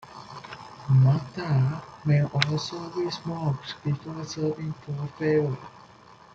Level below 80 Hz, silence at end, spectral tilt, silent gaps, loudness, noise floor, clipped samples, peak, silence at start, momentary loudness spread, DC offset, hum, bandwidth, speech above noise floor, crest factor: -60 dBFS; 0.55 s; -7 dB/octave; none; -27 LUFS; -51 dBFS; under 0.1%; -2 dBFS; 0 s; 18 LU; under 0.1%; none; 7.8 kHz; 26 dB; 24 dB